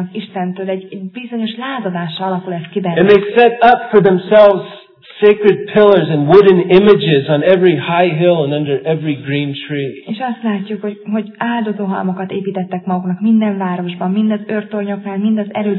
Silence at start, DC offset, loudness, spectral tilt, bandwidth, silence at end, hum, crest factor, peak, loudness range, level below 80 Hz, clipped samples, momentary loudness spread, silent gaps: 0 s; under 0.1%; -13 LUFS; -9.5 dB/octave; 5.4 kHz; 0 s; none; 14 dB; 0 dBFS; 9 LU; -52 dBFS; 0.4%; 13 LU; none